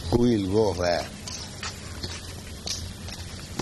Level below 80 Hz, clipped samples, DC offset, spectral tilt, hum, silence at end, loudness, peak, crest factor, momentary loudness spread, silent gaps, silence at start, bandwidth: -42 dBFS; under 0.1%; under 0.1%; -5 dB/octave; none; 0 s; -28 LUFS; -8 dBFS; 20 dB; 14 LU; none; 0 s; 12 kHz